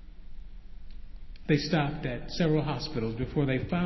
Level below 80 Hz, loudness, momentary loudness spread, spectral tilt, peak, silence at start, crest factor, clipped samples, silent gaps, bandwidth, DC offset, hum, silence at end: -44 dBFS; -30 LUFS; 20 LU; -7 dB/octave; -12 dBFS; 0 s; 18 dB; under 0.1%; none; 6.2 kHz; under 0.1%; none; 0 s